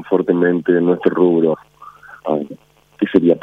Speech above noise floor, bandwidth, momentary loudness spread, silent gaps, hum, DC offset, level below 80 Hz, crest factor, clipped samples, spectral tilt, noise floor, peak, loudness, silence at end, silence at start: 25 dB; 4.1 kHz; 11 LU; none; 50 Hz at -55 dBFS; under 0.1%; -60 dBFS; 16 dB; under 0.1%; -9.5 dB/octave; -40 dBFS; 0 dBFS; -16 LUFS; 0.05 s; 0 s